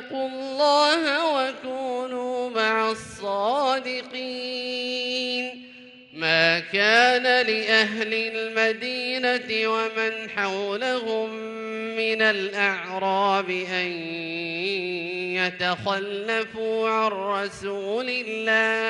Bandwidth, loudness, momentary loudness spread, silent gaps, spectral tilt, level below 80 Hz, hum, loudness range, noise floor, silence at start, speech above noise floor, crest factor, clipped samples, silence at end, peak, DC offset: 11.5 kHz; -24 LUFS; 11 LU; none; -3.5 dB/octave; -70 dBFS; none; 5 LU; -46 dBFS; 0 s; 22 dB; 20 dB; under 0.1%; 0 s; -4 dBFS; under 0.1%